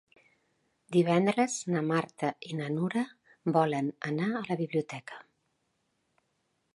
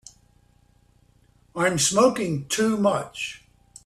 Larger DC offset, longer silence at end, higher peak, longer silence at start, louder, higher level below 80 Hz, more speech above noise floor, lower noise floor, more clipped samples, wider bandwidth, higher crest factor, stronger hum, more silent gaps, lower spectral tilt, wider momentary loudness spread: neither; first, 1.55 s vs 0.5 s; second, -12 dBFS vs -6 dBFS; second, 0.9 s vs 1.55 s; second, -30 LUFS vs -23 LUFS; second, -78 dBFS vs -58 dBFS; first, 48 dB vs 37 dB; first, -77 dBFS vs -60 dBFS; neither; second, 11.5 kHz vs 14.5 kHz; about the same, 20 dB vs 20 dB; neither; neither; first, -6 dB/octave vs -3.5 dB/octave; about the same, 12 LU vs 14 LU